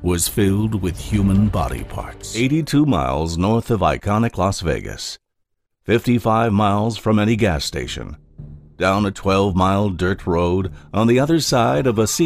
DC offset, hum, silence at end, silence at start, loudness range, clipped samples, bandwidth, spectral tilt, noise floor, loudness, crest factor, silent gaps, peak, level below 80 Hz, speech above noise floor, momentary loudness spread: under 0.1%; none; 0 s; 0 s; 2 LU; under 0.1%; 15.5 kHz; -5.5 dB/octave; -72 dBFS; -19 LUFS; 14 dB; none; -4 dBFS; -34 dBFS; 54 dB; 12 LU